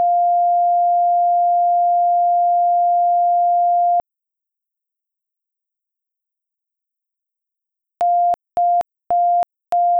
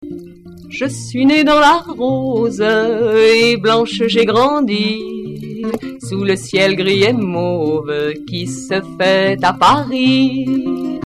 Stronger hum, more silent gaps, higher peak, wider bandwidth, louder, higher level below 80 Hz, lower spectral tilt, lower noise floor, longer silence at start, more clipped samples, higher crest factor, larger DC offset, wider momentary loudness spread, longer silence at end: neither; neither; second, -12 dBFS vs -2 dBFS; second, 2.5 kHz vs 13.5 kHz; about the same, -16 LUFS vs -14 LUFS; second, -68 dBFS vs -48 dBFS; about the same, -5 dB/octave vs -5 dB/octave; first, -84 dBFS vs -35 dBFS; about the same, 0 s vs 0 s; neither; second, 6 dB vs 12 dB; neither; second, 4 LU vs 13 LU; about the same, 0 s vs 0 s